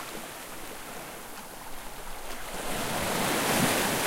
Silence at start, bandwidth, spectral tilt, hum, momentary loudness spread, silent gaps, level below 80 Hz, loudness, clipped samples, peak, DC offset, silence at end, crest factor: 0 s; 16 kHz; -3 dB/octave; none; 17 LU; none; -48 dBFS; -30 LUFS; under 0.1%; -12 dBFS; under 0.1%; 0 s; 20 dB